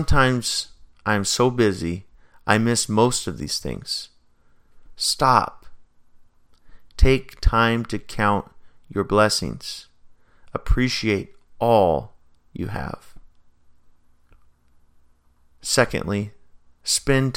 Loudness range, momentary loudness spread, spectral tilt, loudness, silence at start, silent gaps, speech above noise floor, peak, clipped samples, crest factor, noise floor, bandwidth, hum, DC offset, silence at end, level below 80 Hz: 6 LU; 15 LU; -4 dB/octave; -22 LUFS; 0 s; none; 36 dB; 0 dBFS; under 0.1%; 22 dB; -56 dBFS; 17 kHz; none; under 0.1%; 0 s; -32 dBFS